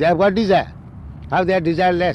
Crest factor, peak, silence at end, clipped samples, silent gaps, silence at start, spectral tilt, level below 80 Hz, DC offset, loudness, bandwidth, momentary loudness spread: 12 dB; -4 dBFS; 0 s; under 0.1%; none; 0 s; -7.5 dB/octave; -40 dBFS; under 0.1%; -17 LUFS; 10.5 kHz; 21 LU